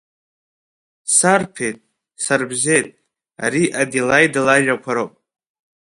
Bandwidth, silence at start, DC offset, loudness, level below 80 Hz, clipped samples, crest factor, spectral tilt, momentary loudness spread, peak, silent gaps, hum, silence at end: 11.5 kHz; 1.05 s; under 0.1%; -17 LUFS; -60 dBFS; under 0.1%; 20 dB; -3 dB/octave; 13 LU; 0 dBFS; none; none; 0.85 s